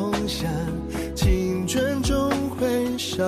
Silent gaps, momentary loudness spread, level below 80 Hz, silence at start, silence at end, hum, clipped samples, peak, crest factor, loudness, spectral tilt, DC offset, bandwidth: none; 6 LU; -32 dBFS; 0 s; 0 s; none; under 0.1%; -10 dBFS; 14 dB; -24 LUFS; -5 dB/octave; under 0.1%; 14 kHz